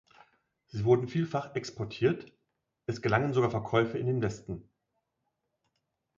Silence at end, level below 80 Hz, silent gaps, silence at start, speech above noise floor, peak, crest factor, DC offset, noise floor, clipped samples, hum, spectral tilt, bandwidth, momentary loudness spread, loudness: 1.55 s; -60 dBFS; none; 0.75 s; 53 dB; -12 dBFS; 20 dB; under 0.1%; -82 dBFS; under 0.1%; none; -7 dB/octave; 7.6 kHz; 15 LU; -30 LUFS